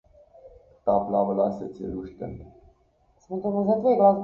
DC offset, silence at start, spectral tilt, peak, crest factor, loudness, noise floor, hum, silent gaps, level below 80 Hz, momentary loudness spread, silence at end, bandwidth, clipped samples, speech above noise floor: under 0.1%; 0.45 s; -10.5 dB/octave; -6 dBFS; 20 dB; -25 LUFS; -64 dBFS; none; none; -54 dBFS; 17 LU; 0 s; 6.6 kHz; under 0.1%; 40 dB